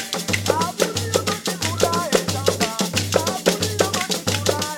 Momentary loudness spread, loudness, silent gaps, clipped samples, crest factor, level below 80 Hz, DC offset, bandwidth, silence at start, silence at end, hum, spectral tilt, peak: 3 LU; -21 LUFS; none; under 0.1%; 18 dB; -54 dBFS; under 0.1%; 19 kHz; 0 s; 0 s; none; -3.5 dB/octave; -4 dBFS